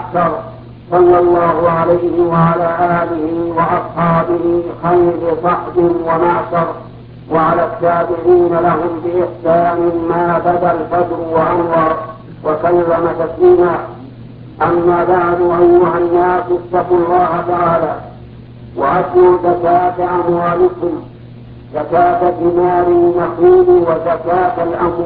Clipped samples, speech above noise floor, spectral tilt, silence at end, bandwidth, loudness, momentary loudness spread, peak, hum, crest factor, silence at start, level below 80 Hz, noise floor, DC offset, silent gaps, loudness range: under 0.1%; 21 dB; -12 dB/octave; 0 s; 4.5 kHz; -13 LUFS; 9 LU; 0 dBFS; none; 12 dB; 0 s; -40 dBFS; -33 dBFS; under 0.1%; none; 2 LU